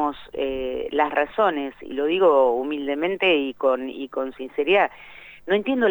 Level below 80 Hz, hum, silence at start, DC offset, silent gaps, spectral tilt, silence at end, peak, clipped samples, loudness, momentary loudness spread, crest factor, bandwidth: -54 dBFS; none; 0 s; under 0.1%; none; -6.5 dB/octave; 0 s; -6 dBFS; under 0.1%; -22 LUFS; 11 LU; 16 dB; over 20 kHz